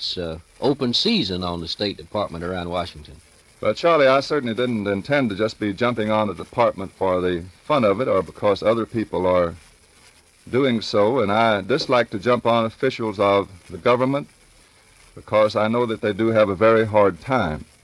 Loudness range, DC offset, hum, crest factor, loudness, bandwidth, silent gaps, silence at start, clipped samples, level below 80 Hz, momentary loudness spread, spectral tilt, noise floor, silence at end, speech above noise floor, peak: 2 LU; under 0.1%; none; 18 dB; -21 LUFS; 11.5 kHz; none; 0 s; under 0.1%; -50 dBFS; 9 LU; -6 dB/octave; -53 dBFS; 0.2 s; 32 dB; -2 dBFS